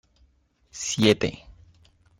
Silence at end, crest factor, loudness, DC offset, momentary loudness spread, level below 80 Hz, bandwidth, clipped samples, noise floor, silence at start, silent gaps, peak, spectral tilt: 0.7 s; 22 dB; -23 LUFS; under 0.1%; 24 LU; -54 dBFS; 16 kHz; under 0.1%; -63 dBFS; 0.75 s; none; -6 dBFS; -4 dB/octave